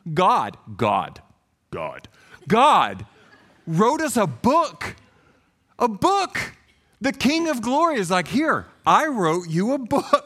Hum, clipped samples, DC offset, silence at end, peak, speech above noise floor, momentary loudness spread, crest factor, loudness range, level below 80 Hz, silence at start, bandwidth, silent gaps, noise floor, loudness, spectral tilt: none; under 0.1%; under 0.1%; 0.05 s; -2 dBFS; 40 dB; 14 LU; 20 dB; 3 LU; -56 dBFS; 0.05 s; 16 kHz; none; -61 dBFS; -21 LUFS; -5 dB/octave